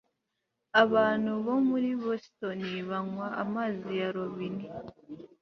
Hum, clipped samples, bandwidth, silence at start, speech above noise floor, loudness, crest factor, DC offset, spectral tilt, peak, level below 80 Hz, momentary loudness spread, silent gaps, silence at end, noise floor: none; under 0.1%; 6.4 kHz; 0.75 s; 53 dB; -30 LUFS; 22 dB; under 0.1%; -7 dB/octave; -8 dBFS; -70 dBFS; 16 LU; none; 0.15 s; -83 dBFS